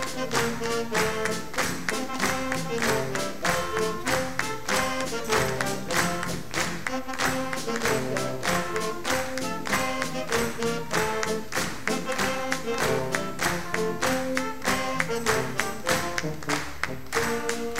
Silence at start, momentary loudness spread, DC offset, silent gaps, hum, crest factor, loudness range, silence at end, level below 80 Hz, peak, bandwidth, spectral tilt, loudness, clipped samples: 0 s; 4 LU; 2%; none; none; 22 dB; 1 LU; 0 s; -50 dBFS; -6 dBFS; 16 kHz; -3 dB/octave; -27 LUFS; under 0.1%